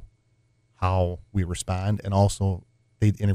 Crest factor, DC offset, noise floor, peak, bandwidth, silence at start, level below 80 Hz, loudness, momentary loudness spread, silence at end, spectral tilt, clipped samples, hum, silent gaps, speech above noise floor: 18 dB; under 0.1%; -65 dBFS; -8 dBFS; 12.5 kHz; 0 s; -44 dBFS; -26 LUFS; 7 LU; 0 s; -6.5 dB/octave; under 0.1%; none; none; 42 dB